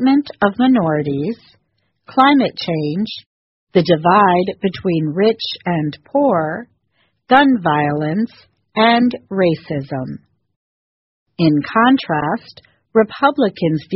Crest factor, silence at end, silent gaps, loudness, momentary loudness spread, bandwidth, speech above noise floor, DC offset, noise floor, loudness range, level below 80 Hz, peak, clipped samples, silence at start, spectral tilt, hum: 16 dB; 0 s; 3.26-3.67 s, 10.56-11.26 s; -16 LUFS; 12 LU; 6 kHz; 51 dB; under 0.1%; -66 dBFS; 3 LU; -56 dBFS; 0 dBFS; under 0.1%; 0 s; -4.5 dB/octave; none